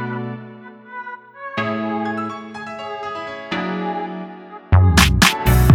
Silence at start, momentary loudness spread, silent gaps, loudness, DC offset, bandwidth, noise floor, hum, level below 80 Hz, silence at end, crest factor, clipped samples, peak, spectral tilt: 0 s; 21 LU; none; -19 LUFS; under 0.1%; 17.5 kHz; -38 dBFS; none; -26 dBFS; 0 s; 18 dB; under 0.1%; 0 dBFS; -5 dB/octave